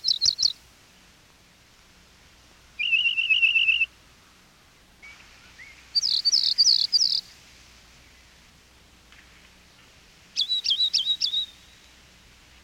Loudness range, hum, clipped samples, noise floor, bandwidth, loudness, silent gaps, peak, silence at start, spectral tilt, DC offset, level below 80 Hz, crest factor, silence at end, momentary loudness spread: 6 LU; none; under 0.1%; -56 dBFS; 17 kHz; -21 LUFS; none; -10 dBFS; 0.05 s; 3 dB/octave; under 0.1%; -62 dBFS; 18 dB; 1.2 s; 10 LU